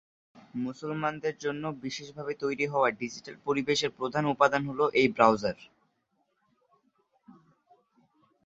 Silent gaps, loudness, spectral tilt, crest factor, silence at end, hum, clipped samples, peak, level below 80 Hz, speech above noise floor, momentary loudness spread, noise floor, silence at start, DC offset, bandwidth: none; -29 LUFS; -5 dB/octave; 26 dB; 1.15 s; none; under 0.1%; -6 dBFS; -68 dBFS; 47 dB; 14 LU; -75 dBFS; 0.35 s; under 0.1%; 8 kHz